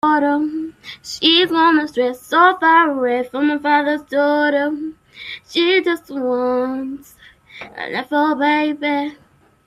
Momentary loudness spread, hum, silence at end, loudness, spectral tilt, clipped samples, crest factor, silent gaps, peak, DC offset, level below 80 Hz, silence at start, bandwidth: 17 LU; none; 0.5 s; -17 LUFS; -3.5 dB/octave; under 0.1%; 16 dB; none; 0 dBFS; under 0.1%; -62 dBFS; 0.05 s; 14 kHz